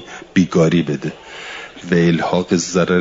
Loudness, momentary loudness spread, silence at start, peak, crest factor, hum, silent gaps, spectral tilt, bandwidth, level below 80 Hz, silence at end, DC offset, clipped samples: -17 LUFS; 16 LU; 0 s; -2 dBFS; 14 dB; none; none; -6 dB/octave; 7.8 kHz; -52 dBFS; 0 s; under 0.1%; under 0.1%